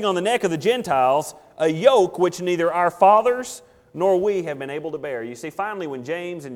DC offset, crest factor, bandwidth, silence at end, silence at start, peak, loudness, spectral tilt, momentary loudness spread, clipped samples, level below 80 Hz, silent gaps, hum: under 0.1%; 18 dB; 18 kHz; 0 s; 0 s; -2 dBFS; -21 LUFS; -5 dB/octave; 14 LU; under 0.1%; -64 dBFS; none; none